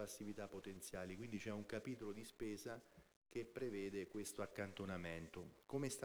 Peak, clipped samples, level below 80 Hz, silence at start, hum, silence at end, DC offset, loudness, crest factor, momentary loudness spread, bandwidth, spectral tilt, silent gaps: -32 dBFS; under 0.1%; -72 dBFS; 0 s; none; 0 s; under 0.1%; -50 LUFS; 18 dB; 6 LU; over 20 kHz; -5 dB/octave; 3.16-3.22 s